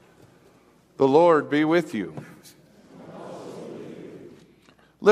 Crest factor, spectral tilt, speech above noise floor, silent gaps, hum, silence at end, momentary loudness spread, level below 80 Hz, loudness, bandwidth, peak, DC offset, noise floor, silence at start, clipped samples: 20 dB; -6.5 dB/octave; 36 dB; none; none; 0 s; 24 LU; -70 dBFS; -21 LUFS; 13 kHz; -4 dBFS; under 0.1%; -57 dBFS; 1 s; under 0.1%